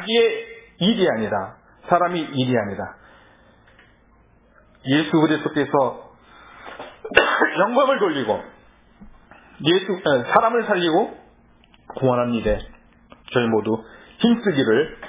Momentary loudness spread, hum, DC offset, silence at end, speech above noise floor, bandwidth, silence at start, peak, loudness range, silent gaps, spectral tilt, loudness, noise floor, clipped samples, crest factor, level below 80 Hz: 16 LU; none; under 0.1%; 0 s; 35 dB; 4 kHz; 0 s; 0 dBFS; 4 LU; none; -9.5 dB/octave; -20 LUFS; -55 dBFS; under 0.1%; 22 dB; -48 dBFS